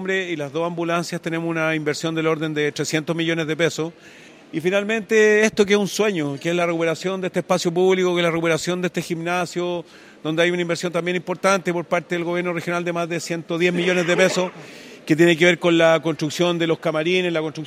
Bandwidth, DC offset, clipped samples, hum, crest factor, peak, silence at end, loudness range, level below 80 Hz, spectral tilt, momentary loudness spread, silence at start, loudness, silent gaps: 15.5 kHz; under 0.1%; under 0.1%; none; 20 dB; -2 dBFS; 0 s; 4 LU; -66 dBFS; -5 dB/octave; 9 LU; 0 s; -20 LUFS; none